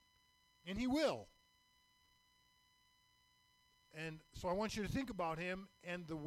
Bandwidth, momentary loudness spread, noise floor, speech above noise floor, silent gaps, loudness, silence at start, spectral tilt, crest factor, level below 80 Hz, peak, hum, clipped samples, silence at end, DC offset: 16 kHz; 12 LU; -75 dBFS; 33 dB; none; -43 LUFS; 0.65 s; -5.5 dB/octave; 18 dB; -64 dBFS; -28 dBFS; none; under 0.1%; 0 s; under 0.1%